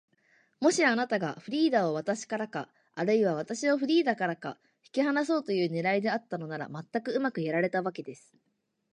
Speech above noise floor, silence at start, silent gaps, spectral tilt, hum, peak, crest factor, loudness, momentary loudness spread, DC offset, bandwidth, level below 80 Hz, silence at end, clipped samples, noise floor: 39 dB; 0.6 s; none; -5 dB/octave; none; -12 dBFS; 18 dB; -29 LUFS; 12 LU; under 0.1%; 11 kHz; -82 dBFS; 0.8 s; under 0.1%; -68 dBFS